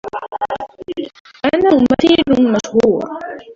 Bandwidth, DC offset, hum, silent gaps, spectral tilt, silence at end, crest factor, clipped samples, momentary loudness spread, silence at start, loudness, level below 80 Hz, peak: 7.6 kHz; under 0.1%; none; 1.20-1.25 s; -5.5 dB/octave; 0 s; 14 dB; under 0.1%; 15 LU; 0.05 s; -14 LUFS; -46 dBFS; -2 dBFS